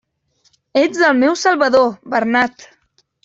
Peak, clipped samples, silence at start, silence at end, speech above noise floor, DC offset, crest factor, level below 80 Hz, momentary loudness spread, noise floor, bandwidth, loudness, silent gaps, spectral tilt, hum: -2 dBFS; under 0.1%; 0.75 s; 0.6 s; 46 dB; under 0.1%; 14 dB; -60 dBFS; 7 LU; -61 dBFS; 7.8 kHz; -15 LUFS; none; -3.5 dB/octave; none